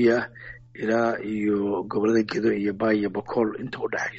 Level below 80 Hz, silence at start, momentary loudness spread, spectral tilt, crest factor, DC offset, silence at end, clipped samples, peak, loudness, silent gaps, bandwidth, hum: -58 dBFS; 0 s; 9 LU; -5 dB/octave; 16 dB; under 0.1%; 0 s; under 0.1%; -8 dBFS; -25 LUFS; none; 8 kHz; none